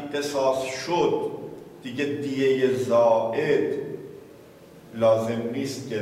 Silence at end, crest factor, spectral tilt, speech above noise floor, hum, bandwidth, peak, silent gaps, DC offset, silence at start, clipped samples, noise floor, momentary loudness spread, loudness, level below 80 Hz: 0 s; 16 dB; -5.5 dB/octave; 24 dB; none; 15 kHz; -10 dBFS; none; under 0.1%; 0 s; under 0.1%; -48 dBFS; 17 LU; -24 LUFS; -66 dBFS